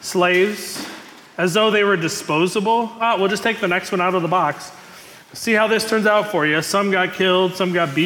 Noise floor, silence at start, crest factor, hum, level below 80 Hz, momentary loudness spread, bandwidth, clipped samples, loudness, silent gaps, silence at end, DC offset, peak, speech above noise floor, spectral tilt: -42 dBFS; 0 s; 14 dB; none; -64 dBFS; 12 LU; 18 kHz; under 0.1%; -18 LUFS; none; 0 s; under 0.1%; -6 dBFS; 24 dB; -4 dB/octave